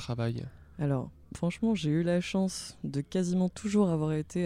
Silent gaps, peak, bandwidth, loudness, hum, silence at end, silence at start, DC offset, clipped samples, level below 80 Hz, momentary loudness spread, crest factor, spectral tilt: none; -14 dBFS; 12.5 kHz; -31 LUFS; none; 0 s; 0 s; under 0.1%; under 0.1%; -56 dBFS; 8 LU; 16 dB; -6.5 dB/octave